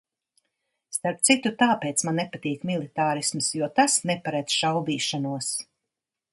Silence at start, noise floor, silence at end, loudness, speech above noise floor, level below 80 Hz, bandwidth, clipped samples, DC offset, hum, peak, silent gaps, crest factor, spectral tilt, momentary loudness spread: 0.9 s; -86 dBFS; 0.7 s; -24 LUFS; 61 dB; -72 dBFS; 12 kHz; under 0.1%; under 0.1%; none; -6 dBFS; none; 22 dB; -3 dB/octave; 9 LU